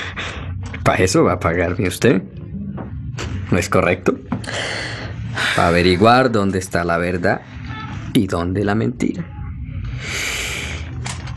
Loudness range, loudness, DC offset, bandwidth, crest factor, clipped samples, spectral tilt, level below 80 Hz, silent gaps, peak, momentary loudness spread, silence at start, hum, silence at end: 5 LU; -19 LUFS; under 0.1%; 14 kHz; 18 dB; under 0.1%; -5 dB/octave; -38 dBFS; none; 0 dBFS; 15 LU; 0 s; none; 0 s